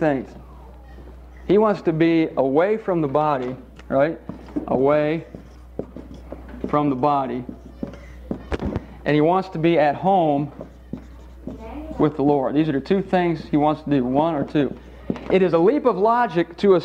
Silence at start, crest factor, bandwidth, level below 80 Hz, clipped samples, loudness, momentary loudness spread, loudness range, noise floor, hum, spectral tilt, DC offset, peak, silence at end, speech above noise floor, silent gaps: 0 s; 16 dB; 8 kHz; -44 dBFS; under 0.1%; -20 LUFS; 19 LU; 5 LU; -41 dBFS; none; -8.5 dB/octave; under 0.1%; -4 dBFS; 0 s; 22 dB; none